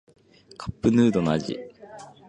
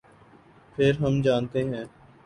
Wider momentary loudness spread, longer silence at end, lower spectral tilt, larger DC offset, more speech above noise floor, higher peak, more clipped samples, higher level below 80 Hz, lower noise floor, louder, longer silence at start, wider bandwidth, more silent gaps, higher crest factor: first, 23 LU vs 16 LU; second, 0.2 s vs 0.4 s; about the same, -7 dB/octave vs -7.5 dB/octave; neither; second, 23 dB vs 30 dB; about the same, -8 dBFS vs -8 dBFS; neither; about the same, -52 dBFS vs -54 dBFS; second, -45 dBFS vs -54 dBFS; about the same, -23 LUFS vs -25 LUFS; second, 0.6 s vs 0.8 s; second, 9.2 kHz vs 10.5 kHz; neither; about the same, 18 dB vs 18 dB